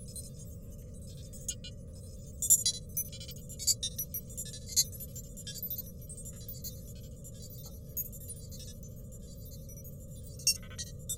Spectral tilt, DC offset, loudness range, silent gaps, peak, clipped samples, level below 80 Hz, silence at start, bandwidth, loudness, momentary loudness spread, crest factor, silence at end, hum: -1.5 dB/octave; under 0.1%; 13 LU; none; -8 dBFS; under 0.1%; -50 dBFS; 0 s; 17 kHz; -33 LUFS; 18 LU; 30 dB; 0 s; none